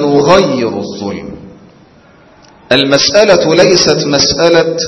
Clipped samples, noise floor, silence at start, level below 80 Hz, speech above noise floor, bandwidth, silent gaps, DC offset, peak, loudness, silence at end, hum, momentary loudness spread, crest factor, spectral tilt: 0.3%; -42 dBFS; 0 s; -42 dBFS; 33 dB; 11 kHz; none; under 0.1%; 0 dBFS; -9 LUFS; 0 s; none; 14 LU; 10 dB; -3.5 dB/octave